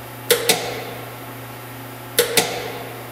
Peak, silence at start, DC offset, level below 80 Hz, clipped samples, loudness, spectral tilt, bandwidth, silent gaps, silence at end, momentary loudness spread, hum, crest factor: 0 dBFS; 0 s; under 0.1%; -56 dBFS; under 0.1%; -20 LUFS; -2 dB/octave; 16.5 kHz; none; 0 s; 17 LU; none; 24 dB